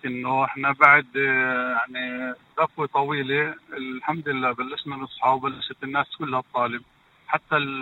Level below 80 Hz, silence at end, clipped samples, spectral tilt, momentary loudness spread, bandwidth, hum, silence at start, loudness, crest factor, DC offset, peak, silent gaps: -70 dBFS; 0 s; under 0.1%; -6.5 dB/octave; 14 LU; 16.5 kHz; none; 0.05 s; -23 LUFS; 24 dB; under 0.1%; 0 dBFS; none